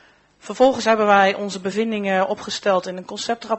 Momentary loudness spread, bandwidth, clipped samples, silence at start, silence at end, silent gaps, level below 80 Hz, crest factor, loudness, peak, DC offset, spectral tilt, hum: 11 LU; 8.4 kHz; under 0.1%; 0.45 s; 0 s; none; -60 dBFS; 20 dB; -19 LUFS; 0 dBFS; under 0.1%; -4 dB/octave; none